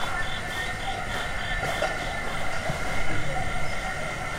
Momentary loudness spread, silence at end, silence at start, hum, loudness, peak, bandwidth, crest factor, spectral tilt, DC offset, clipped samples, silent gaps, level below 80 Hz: 3 LU; 0 s; 0 s; none; -29 LUFS; -12 dBFS; 16 kHz; 14 dB; -3.5 dB/octave; under 0.1%; under 0.1%; none; -36 dBFS